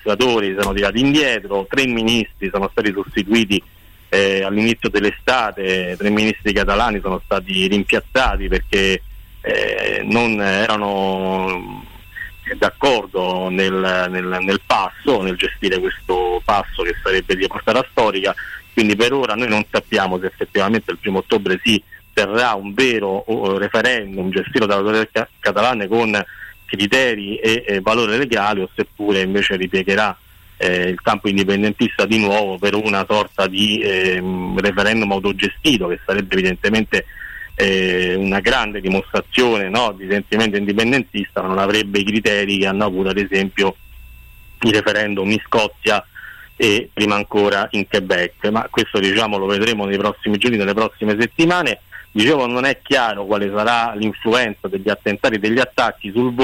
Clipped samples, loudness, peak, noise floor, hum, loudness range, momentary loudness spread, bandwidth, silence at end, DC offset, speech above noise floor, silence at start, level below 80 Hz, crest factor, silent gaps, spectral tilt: under 0.1%; -17 LUFS; -6 dBFS; -41 dBFS; none; 2 LU; 5 LU; 16.5 kHz; 0 s; under 0.1%; 23 dB; 0.05 s; -38 dBFS; 12 dB; none; -4.5 dB/octave